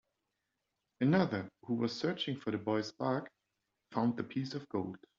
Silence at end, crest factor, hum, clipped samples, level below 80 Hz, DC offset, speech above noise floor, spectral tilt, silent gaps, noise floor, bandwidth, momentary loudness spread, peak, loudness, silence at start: 0.2 s; 20 dB; none; under 0.1%; -76 dBFS; under 0.1%; 51 dB; -5.5 dB/octave; none; -86 dBFS; 7.6 kHz; 9 LU; -16 dBFS; -36 LUFS; 1 s